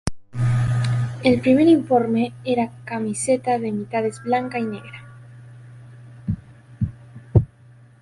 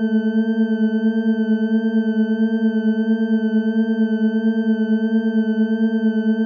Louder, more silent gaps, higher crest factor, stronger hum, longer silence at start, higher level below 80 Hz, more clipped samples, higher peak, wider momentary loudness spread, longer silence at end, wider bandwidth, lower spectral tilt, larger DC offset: about the same, -21 LUFS vs -19 LUFS; neither; first, 20 dB vs 8 dB; neither; about the same, 0.05 s vs 0 s; first, -42 dBFS vs under -90 dBFS; neither; first, -2 dBFS vs -8 dBFS; first, 14 LU vs 1 LU; first, 0.55 s vs 0 s; first, 11.5 kHz vs 4.9 kHz; second, -7 dB/octave vs -9.5 dB/octave; neither